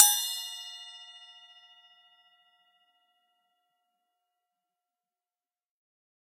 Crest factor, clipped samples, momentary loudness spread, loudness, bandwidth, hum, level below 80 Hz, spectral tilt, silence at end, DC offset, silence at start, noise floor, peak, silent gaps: 32 dB; under 0.1%; 25 LU; -28 LUFS; 16 kHz; none; under -90 dBFS; 7.5 dB/octave; 5.15 s; under 0.1%; 0 s; under -90 dBFS; -2 dBFS; none